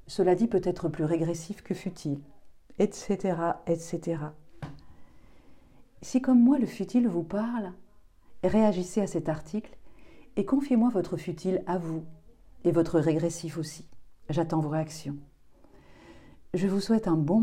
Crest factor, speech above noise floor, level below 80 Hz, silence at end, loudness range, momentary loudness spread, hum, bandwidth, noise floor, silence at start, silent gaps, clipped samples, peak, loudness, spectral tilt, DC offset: 18 dB; 27 dB; -56 dBFS; 0 s; 5 LU; 14 LU; none; 13.5 kHz; -54 dBFS; 0.05 s; none; under 0.1%; -12 dBFS; -28 LUFS; -7 dB/octave; under 0.1%